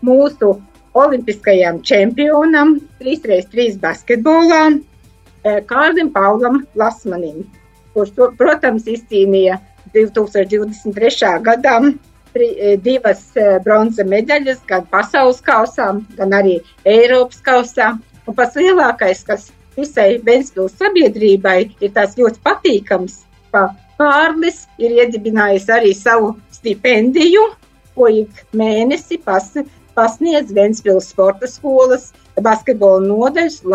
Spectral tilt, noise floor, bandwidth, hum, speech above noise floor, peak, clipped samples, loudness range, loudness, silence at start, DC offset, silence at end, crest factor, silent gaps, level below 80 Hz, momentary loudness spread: -5 dB/octave; -45 dBFS; 8.6 kHz; none; 33 dB; 0 dBFS; under 0.1%; 2 LU; -13 LUFS; 0 s; under 0.1%; 0 s; 12 dB; none; -50 dBFS; 9 LU